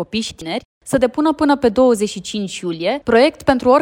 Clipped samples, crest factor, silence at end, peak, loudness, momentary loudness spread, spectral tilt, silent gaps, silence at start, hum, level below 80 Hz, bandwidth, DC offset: under 0.1%; 16 dB; 0 s; -2 dBFS; -17 LUFS; 11 LU; -4.5 dB/octave; 0.65-0.81 s; 0 s; none; -46 dBFS; 16 kHz; under 0.1%